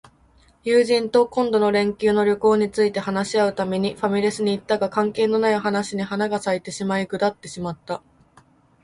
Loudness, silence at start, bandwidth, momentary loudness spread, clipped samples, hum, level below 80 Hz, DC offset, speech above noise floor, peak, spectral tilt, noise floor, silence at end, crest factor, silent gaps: -21 LUFS; 0.65 s; 11.5 kHz; 9 LU; under 0.1%; none; -58 dBFS; under 0.1%; 35 dB; -6 dBFS; -5.5 dB/octave; -56 dBFS; 0.85 s; 16 dB; none